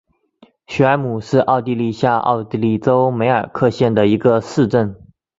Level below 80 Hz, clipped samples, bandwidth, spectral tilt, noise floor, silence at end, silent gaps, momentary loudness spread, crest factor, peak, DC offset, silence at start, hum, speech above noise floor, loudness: -50 dBFS; under 0.1%; 7.8 kHz; -7.5 dB/octave; -52 dBFS; 0.35 s; none; 5 LU; 16 dB; -2 dBFS; under 0.1%; 0.7 s; none; 36 dB; -16 LUFS